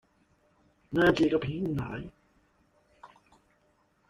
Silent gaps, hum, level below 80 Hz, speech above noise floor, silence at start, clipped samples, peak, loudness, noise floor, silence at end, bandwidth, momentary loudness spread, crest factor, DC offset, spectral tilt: none; none; -56 dBFS; 42 dB; 0.9 s; under 0.1%; -12 dBFS; -28 LUFS; -69 dBFS; 1.05 s; 13 kHz; 17 LU; 20 dB; under 0.1%; -7 dB/octave